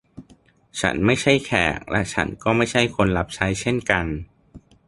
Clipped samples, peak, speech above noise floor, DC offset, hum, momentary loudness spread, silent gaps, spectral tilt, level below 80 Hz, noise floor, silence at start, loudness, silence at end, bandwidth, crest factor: under 0.1%; -2 dBFS; 34 dB; under 0.1%; none; 6 LU; none; -5 dB/octave; -40 dBFS; -55 dBFS; 0.15 s; -21 LUFS; 0.3 s; 11.5 kHz; 20 dB